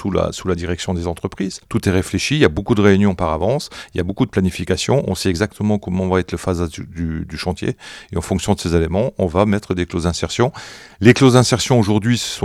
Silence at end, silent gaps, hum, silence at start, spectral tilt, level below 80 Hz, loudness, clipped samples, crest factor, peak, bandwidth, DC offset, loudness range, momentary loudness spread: 0 s; none; none; 0 s; -5.5 dB/octave; -36 dBFS; -18 LUFS; under 0.1%; 18 dB; 0 dBFS; 15 kHz; under 0.1%; 5 LU; 11 LU